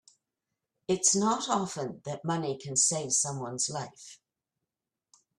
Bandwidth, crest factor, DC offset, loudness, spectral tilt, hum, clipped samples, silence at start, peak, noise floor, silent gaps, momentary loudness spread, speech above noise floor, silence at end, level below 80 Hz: 14 kHz; 22 dB; under 0.1%; -28 LUFS; -3 dB/octave; none; under 0.1%; 0.9 s; -10 dBFS; -89 dBFS; none; 16 LU; 58 dB; 1.25 s; -72 dBFS